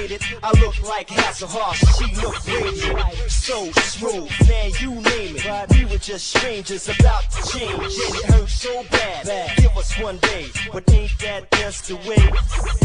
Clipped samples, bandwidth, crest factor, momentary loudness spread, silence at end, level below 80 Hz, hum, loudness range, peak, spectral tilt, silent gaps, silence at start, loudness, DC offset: under 0.1%; 10 kHz; 16 dB; 8 LU; 0 s; -20 dBFS; none; 1 LU; -2 dBFS; -4.5 dB/octave; none; 0 s; -20 LUFS; under 0.1%